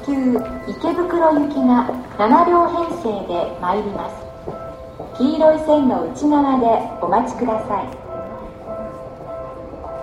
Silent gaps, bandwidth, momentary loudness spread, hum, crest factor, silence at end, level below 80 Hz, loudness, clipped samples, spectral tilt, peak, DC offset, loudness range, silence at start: none; 11 kHz; 17 LU; none; 18 dB; 0 s; -44 dBFS; -18 LUFS; under 0.1%; -7 dB/octave; 0 dBFS; under 0.1%; 4 LU; 0 s